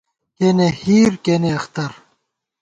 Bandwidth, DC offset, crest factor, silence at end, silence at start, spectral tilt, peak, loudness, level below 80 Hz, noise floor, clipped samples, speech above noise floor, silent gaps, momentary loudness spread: 9 kHz; under 0.1%; 14 dB; 0.7 s; 0.4 s; -6.5 dB/octave; -4 dBFS; -17 LUFS; -52 dBFS; -70 dBFS; under 0.1%; 54 dB; none; 12 LU